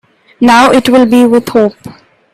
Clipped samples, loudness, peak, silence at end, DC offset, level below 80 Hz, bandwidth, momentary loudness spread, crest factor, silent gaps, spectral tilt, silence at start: 0.1%; -7 LUFS; 0 dBFS; 0.45 s; under 0.1%; -46 dBFS; 14.5 kHz; 6 LU; 8 dB; none; -4.5 dB/octave; 0.4 s